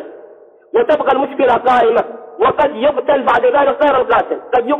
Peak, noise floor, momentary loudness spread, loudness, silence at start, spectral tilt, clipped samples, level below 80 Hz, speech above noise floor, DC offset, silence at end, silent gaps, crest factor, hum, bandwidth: -4 dBFS; -41 dBFS; 5 LU; -14 LUFS; 0 s; -6 dB/octave; under 0.1%; -48 dBFS; 28 dB; under 0.1%; 0 s; none; 10 dB; none; 6.8 kHz